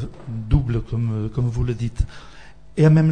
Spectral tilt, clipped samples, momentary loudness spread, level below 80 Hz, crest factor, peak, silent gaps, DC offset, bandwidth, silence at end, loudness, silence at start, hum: -9 dB/octave; under 0.1%; 15 LU; -30 dBFS; 16 dB; -4 dBFS; none; 0.8%; 9.2 kHz; 0 s; -22 LUFS; 0 s; none